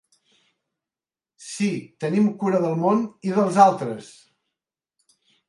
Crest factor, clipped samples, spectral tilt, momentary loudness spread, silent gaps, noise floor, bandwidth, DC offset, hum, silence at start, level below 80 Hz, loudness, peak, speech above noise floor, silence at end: 22 dB; under 0.1%; -6.5 dB/octave; 16 LU; none; under -90 dBFS; 11.5 kHz; under 0.1%; none; 1.4 s; -74 dBFS; -21 LUFS; -2 dBFS; over 69 dB; 1.45 s